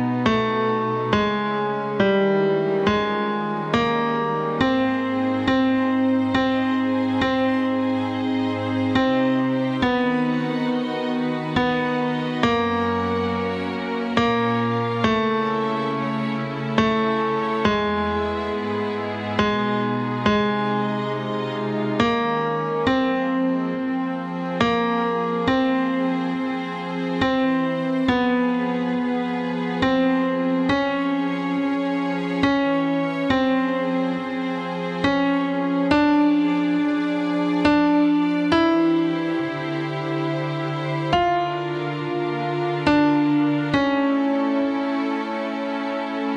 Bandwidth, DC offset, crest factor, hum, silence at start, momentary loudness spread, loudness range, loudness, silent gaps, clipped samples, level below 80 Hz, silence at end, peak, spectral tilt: 8.2 kHz; under 0.1%; 18 dB; none; 0 s; 6 LU; 2 LU; -22 LUFS; none; under 0.1%; -52 dBFS; 0 s; -4 dBFS; -7 dB/octave